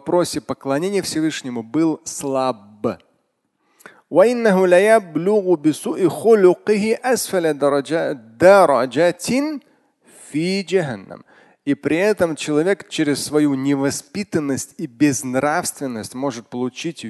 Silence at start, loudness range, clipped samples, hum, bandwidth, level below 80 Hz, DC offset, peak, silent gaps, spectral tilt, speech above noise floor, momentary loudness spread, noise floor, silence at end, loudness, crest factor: 0.05 s; 7 LU; under 0.1%; none; 12.5 kHz; -60 dBFS; under 0.1%; 0 dBFS; none; -5 dB/octave; 51 dB; 13 LU; -68 dBFS; 0 s; -18 LUFS; 18 dB